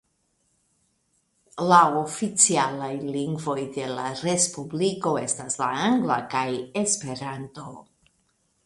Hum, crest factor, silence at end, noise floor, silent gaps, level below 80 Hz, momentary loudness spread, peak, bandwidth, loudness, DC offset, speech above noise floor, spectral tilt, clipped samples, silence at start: none; 24 dB; 0.85 s; -71 dBFS; none; -66 dBFS; 15 LU; -2 dBFS; 11.5 kHz; -24 LUFS; under 0.1%; 46 dB; -3.5 dB/octave; under 0.1%; 1.55 s